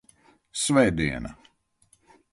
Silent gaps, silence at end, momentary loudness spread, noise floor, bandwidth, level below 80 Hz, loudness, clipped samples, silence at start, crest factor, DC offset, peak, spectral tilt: none; 1 s; 15 LU; -65 dBFS; 12 kHz; -46 dBFS; -24 LUFS; under 0.1%; 0.55 s; 20 dB; under 0.1%; -8 dBFS; -4.5 dB/octave